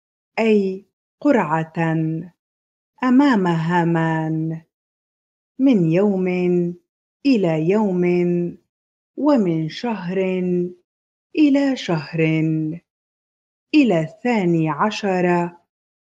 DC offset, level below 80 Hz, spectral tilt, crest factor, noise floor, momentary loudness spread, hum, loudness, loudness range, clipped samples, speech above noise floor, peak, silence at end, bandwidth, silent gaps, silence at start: under 0.1%; -66 dBFS; -7.5 dB/octave; 16 dB; under -90 dBFS; 10 LU; none; -19 LUFS; 2 LU; under 0.1%; over 72 dB; -4 dBFS; 0.55 s; 7.8 kHz; 0.93-1.18 s, 2.39-2.93 s, 4.74-5.55 s, 6.89-7.20 s, 8.69-9.14 s, 10.84-11.30 s, 12.90-13.67 s; 0.35 s